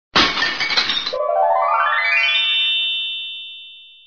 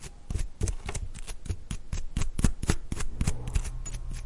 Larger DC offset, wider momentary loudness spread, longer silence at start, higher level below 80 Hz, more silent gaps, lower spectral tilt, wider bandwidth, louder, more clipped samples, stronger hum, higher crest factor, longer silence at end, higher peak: neither; first, 12 LU vs 9 LU; first, 0.15 s vs 0 s; second, -52 dBFS vs -32 dBFS; neither; second, -1.5 dB/octave vs -5 dB/octave; second, 5.4 kHz vs 11.5 kHz; first, -16 LUFS vs -35 LUFS; neither; neither; second, 18 dB vs 24 dB; first, 0.2 s vs 0 s; first, -2 dBFS vs -6 dBFS